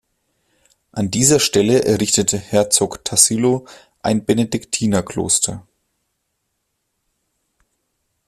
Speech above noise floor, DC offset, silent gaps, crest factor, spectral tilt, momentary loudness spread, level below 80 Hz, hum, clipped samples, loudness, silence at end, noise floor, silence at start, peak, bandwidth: 56 dB; under 0.1%; none; 20 dB; -3.5 dB/octave; 10 LU; -52 dBFS; none; under 0.1%; -16 LUFS; 2.65 s; -73 dBFS; 0.95 s; 0 dBFS; 15 kHz